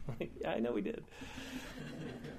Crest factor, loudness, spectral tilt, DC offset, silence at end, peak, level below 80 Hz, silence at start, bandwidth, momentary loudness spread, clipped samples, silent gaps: 18 dB; -42 LUFS; -6 dB/octave; under 0.1%; 0 s; -24 dBFS; -58 dBFS; 0 s; 15.5 kHz; 11 LU; under 0.1%; none